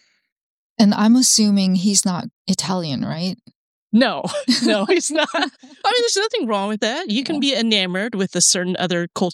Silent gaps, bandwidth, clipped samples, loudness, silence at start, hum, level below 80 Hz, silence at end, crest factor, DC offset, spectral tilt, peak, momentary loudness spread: 2.33-2.45 s, 3.55-3.90 s; 16 kHz; under 0.1%; -18 LUFS; 0.8 s; none; -66 dBFS; 0 s; 16 dB; under 0.1%; -3.5 dB/octave; -2 dBFS; 10 LU